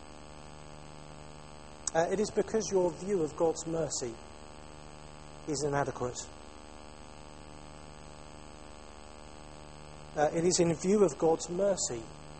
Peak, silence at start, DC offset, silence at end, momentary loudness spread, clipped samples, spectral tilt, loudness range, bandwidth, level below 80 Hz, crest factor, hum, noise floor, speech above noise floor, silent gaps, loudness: -14 dBFS; 0 s; 0.2%; 0 s; 22 LU; under 0.1%; -4.5 dB/octave; 18 LU; 8.8 kHz; -56 dBFS; 20 dB; 50 Hz at -55 dBFS; -50 dBFS; 20 dB; none; -31 LUFS